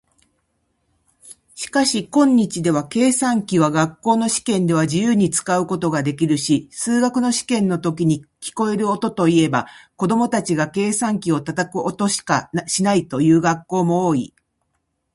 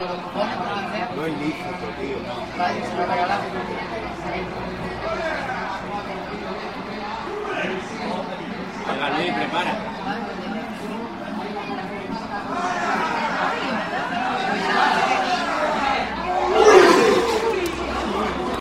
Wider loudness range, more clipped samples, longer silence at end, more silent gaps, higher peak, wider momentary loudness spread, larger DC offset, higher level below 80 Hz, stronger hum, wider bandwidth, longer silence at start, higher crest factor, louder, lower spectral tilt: second, 2 LU vs 10 LU; neither; first, 0.85 s vs 0 s; neither; about the same, -2 dBFS vs -2 dBFS; second, 6 LU vs 11 LU; second, under 0.1% vs 0.1%; second, -58 dBFS vs -46 dBFS; neither; second, 11.5 kHz vs 16 kHz; first, 1.25 s vs 0 s; about the same, 18 dB vs 22 dB; first, -19 LUFS vs -23 LUFS; about the same, -5 dB/octave vs -4.5 dB/octave